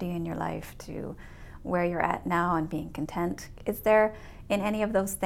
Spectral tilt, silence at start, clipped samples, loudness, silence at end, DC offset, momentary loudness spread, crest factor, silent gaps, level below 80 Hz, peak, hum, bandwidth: -6 dB/octave; 0 s; under 0.1%; -29 LUFS; 0 s; under 0.1%; 17 LU; 18 dB; none; -48 dBFS; -10 dBFS; none; 17.5 kHz